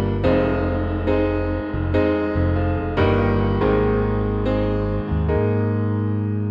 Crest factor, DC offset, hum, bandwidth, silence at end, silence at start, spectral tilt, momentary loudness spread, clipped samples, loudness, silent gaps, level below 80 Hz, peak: 14 dB; under 0.1%; none; 5.4 kHz; 0 s; 0 s; -10 dB/octave; 4 LU; under 0.1%; -21 LUFS; none; -30 dBFS; -6 dBFS